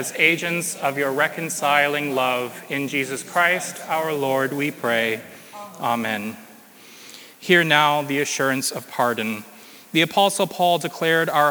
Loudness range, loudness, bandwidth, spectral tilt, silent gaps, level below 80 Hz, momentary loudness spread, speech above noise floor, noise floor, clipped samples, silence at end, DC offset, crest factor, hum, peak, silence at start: 4 LU; -21 LUFS; over 20 kHz; -3 dB/octave; none; -78 dBFS; 14 LU; 25 dB; -46 dBFS; under 0.1%; 0 s; under 0.1%; 22 dB; none; 0 dBFS; 0 s